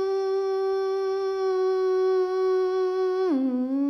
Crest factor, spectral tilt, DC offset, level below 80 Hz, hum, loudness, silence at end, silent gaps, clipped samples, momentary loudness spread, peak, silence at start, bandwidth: 8 dB; -4.5 dB/octave; under 0.1%; -70 dBFS; none; -25 LUFS; 0 s; none; under 0.1%; 3 LU; -16 dBFS; 0 s; 6.2 kHz